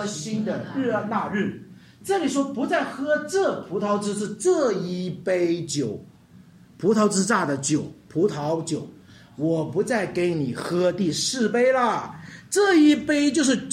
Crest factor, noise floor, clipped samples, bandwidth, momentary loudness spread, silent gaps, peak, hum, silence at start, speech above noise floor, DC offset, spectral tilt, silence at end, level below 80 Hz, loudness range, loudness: 16 dB; -50 dBFS; under 0.1%; 14.5 kHz; 9 LU; none; -8 dBFS; none; 0 s; 27 dB; under 0.1%; -4.5 dB/octave; 0 s; -64 dBFS; 4 LU; -23 LUFS